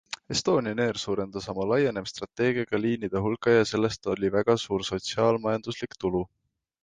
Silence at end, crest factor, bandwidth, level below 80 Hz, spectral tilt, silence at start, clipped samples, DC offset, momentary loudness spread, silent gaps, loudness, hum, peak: 0.6 s; 18 dB; 9.6 kHz; -56 dBFS; -5 dB/octave; 0.1 s; under 0.1%; under 0.1%; 8 LU; none; -27 LUFS; none; -10 dBFS